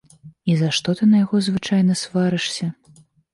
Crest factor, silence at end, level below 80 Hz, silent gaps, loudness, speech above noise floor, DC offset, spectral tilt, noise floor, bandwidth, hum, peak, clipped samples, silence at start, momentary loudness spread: 12 dB; 0.6 s; -58 dBFS; none; -20 LUFS; 34 dB; under 0.1%; -5.5 dB/octave; -52 dBFS; 11.5 kHz; none; -8 dBFS; under 0.1%; 0.25 s; 9 LU